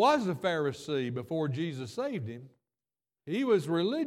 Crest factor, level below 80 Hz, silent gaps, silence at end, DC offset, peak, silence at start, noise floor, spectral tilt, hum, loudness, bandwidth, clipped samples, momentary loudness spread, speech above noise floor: 18 dB; -76 dBFS; none; 0 s; under 0.1%; -12 dBFS; 0 s; under -90 dBFS; -6.5 dB/octave; none; -31 LUFS; 15.5 kHz; under 0.1%; 11 LU; over 60 dB